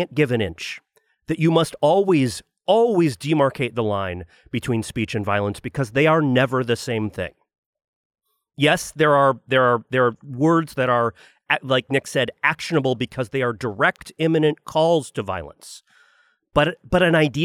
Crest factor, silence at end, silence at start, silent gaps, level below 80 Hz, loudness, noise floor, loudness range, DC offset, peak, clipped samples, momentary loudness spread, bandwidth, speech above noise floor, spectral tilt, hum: 18 dB; 0 s; 0 s; 7.58-7.73 s, 7.84-8.10 s; -50 dBFS; -21 LUFS; -60 dBFS; 3 LU; under 0.1%; -4 dBFS; under 0.1%; 11 LU; 15.5 kHz; 40 dB; -5.5 dB/octave; none